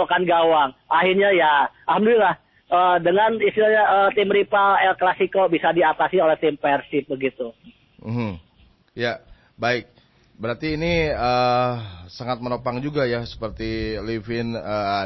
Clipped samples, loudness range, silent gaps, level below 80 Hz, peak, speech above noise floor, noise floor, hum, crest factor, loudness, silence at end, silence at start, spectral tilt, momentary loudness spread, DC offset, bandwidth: under 0.1%; 9 LU; none; -46 dBFS; -6 dBFS; 36 dB; -56 dBFS; none; 14 dB; -20 LUFS; 0 s; 0 s; -7 dB/octave; 13 LU; under 0.1%; 6 kHz